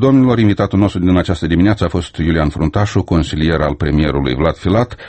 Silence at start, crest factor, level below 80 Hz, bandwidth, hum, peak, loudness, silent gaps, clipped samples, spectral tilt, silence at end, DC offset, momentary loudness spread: 0 s; 14 dB; -28 dBFS; 8.8 kHz; none; 0 dBFS; -14 LUFS; none; under 0.1%; -7.5 dB/octave; 0 s; under 0.1%; 4 LU